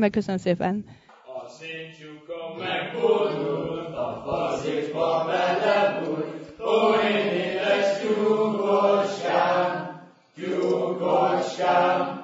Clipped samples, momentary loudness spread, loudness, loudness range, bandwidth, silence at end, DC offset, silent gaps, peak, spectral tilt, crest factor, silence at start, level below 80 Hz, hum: under 0.1%; 15 LU; -24 LUFS; 6 LU; 7.8 kHz; 0 s; under 0.1%; none; -8 dBFS; -5.5 dB/octave; 16 dB; 0 s; -62 dBFS; none